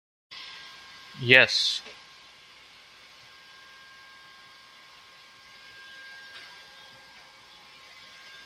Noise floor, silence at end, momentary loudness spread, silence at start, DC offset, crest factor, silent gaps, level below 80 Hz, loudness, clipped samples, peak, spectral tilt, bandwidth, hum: -52 dBFS; 2.05 s; 30 LU; 0.3 s; under 0.1%; 30 dB; none; -72 dBFS; -20 LUFS; under 0.1%; -2 dBFS; -2.5 dB/octave; 15.5 kHz; none